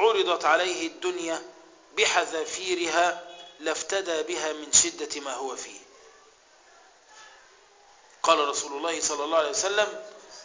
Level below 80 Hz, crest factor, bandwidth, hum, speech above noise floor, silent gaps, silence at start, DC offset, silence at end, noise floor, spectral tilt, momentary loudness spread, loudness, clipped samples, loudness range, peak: -68 dBFS; 24 dB; 7.8 kHz; none; 30 dB; none; 0 s; under 0.1%; 0 s; -57 dBFS; 0 dB/octave; 13 LU; -25 LUFS; under 0.1%; 6 LU; -4 dBFS